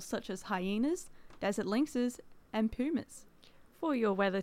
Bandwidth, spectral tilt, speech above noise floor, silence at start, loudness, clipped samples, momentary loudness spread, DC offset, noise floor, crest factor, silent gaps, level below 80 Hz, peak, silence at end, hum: 16 kHz; -5.5 dB/octave; 25 dB; 0 s; -35 LUFS; under 0.1%; 12 LU; under 0.1%; -59 dBFS; 16 dB; none; -60 dBFS; -18 dBFS; 0 s; none